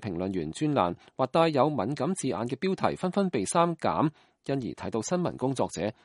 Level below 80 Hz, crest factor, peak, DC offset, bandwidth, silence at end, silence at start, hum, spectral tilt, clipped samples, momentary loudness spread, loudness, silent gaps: -62 dBFS; 20 dB; -8 dBFS; under 0.1%; 11.5 kHz; 0.15 s; 0 s; none; -6 dB/octave; under 0.1%; 7 LU; -28 LUFS; none